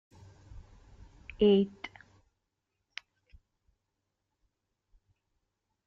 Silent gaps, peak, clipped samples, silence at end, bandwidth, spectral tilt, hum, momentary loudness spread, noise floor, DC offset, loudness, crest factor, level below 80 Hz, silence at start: none; -14 dBFS; under 0.1%; 4 s; 6.6 kHz; -7.5 dB/octave; none; 25 LU; -84 dBFS; under 0.1%; -27 LUFS; 22 dB; -60 dBFS; 0.55 s